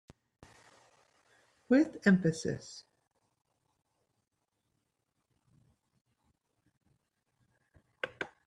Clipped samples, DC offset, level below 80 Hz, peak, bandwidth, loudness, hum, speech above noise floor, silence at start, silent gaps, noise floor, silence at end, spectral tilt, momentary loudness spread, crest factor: under 0.1%; under 0.1%; -72 dBFS; -14 dBFS; 11 kHz; -31 LUFS; none; 54 dB; 1.7 s; 6.01-6.05 s, 6.77-6.81 s; -83 dBFS; 0.2 s; -6.5 dB/octave; 18 LU; 24 dB